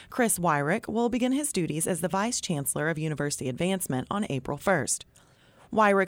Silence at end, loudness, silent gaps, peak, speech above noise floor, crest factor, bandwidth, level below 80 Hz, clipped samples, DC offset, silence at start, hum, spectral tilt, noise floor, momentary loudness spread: 0 s; -27 LUFS; none; -10 dBFS; 31 dB; 16 dB; 17.5 kHz; -58 dBFS; under 0.1%; under 0.1%; 0 s; none; -4.5 dB/octave; -58 dBFS; 6 LU